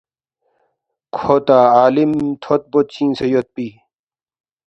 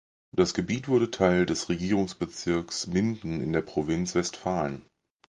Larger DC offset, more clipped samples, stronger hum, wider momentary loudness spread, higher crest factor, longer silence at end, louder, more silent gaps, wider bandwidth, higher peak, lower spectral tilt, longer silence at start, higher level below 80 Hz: neither; neither; neither; first, 16 LU vs 8 LU; about the same, 16 dB vs 20 dB; first, 0.95 s vs 0.5 s; first, -15 LUFS vs -28 LUFS; neither; second, 8.2 kHz vs 10 kHz; first, 0 dBFS vs -8 dBFS; first, -7.5 dB/octave vs -5.5 dB/octave; first, 1.15 s vs 0.35 s; about the same, -56 dBFS vs -52 dBFS